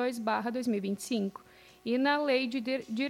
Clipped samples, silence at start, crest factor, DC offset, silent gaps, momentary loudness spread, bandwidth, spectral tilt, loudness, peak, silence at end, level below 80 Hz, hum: under 0.1%; 0 s; 16 dB; under 0.1%; none; 8 LU; 16 kHz; -4.5 dB/octave; -31 LUFS; -16 dBFS; 0 s; -74 dBFS; none